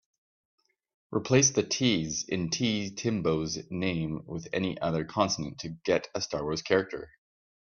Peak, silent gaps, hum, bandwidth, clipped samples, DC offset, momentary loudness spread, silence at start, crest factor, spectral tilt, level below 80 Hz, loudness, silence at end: -8 dBFS; none; none; 7.4 kHz; under 0.1%; under 0.1%; 10 LU; 1.1 s; 22 dB; -4 dB/octave; -60 dBFS; -29 LUFS; 0.6 s